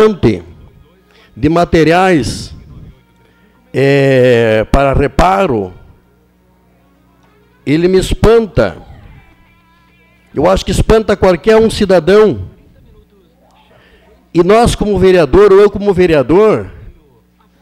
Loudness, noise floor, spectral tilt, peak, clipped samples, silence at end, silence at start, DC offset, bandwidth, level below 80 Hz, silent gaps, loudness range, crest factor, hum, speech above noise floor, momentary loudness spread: -10 LUFS; -50 dBFS; -6.5 dB/octave; -2 dBFS; under 0.1%; 0.7 s; 0 s; under 0.1%; 14 kHz; -26 dBFS; none; 5 LU; 10 dB; 60 Hz at -45 dBFS; 41 dB; 11 LU